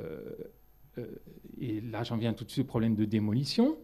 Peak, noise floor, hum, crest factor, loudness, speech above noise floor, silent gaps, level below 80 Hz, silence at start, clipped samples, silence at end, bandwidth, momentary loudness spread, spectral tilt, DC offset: -16 dBFS; -57 dBFS; none; 16 dB; -32 LUFS; 26 dB; none; -60 dBFS; 0 s; under 0.1%; 0 s; 14 kHz; 19 LU; -7 dB/octave; under 0.1%